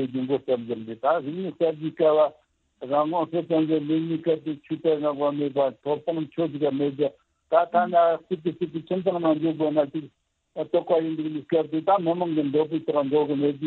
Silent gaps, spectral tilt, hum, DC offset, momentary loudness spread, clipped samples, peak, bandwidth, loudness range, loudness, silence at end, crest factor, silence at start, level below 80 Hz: none; -10 dB/octave; none; under 0.1%; 7 LU; under 0.1%; -8 dBFS; 4.3 kHz; 2 LU; -25 LUFS; 0 s; 18 dB; 0 s; -70 dBFS